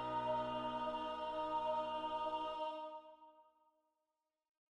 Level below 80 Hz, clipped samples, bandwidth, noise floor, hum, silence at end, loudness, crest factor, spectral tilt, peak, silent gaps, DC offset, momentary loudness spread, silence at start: -72 dBFS; under 0.1%; 9.6 kHz; under -90 dBFS; none; 1.35 s; -42 LUFS; 14 dB; -5.5 dB/octave; -30 dBFS; none; under 0.1%; 10 LU; 0 s